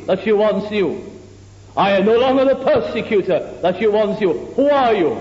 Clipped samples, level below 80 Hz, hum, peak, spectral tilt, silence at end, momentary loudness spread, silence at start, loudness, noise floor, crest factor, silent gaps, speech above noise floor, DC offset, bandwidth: under 0.1%; -50 dBFS; none; -4 dBFS; -7 dB/octave; 0 s; 7 LU; 0 s; -17 LUFS; -41 dBFS; 12 dB; none; 25 dB; under 0.1%; 7.8 kHz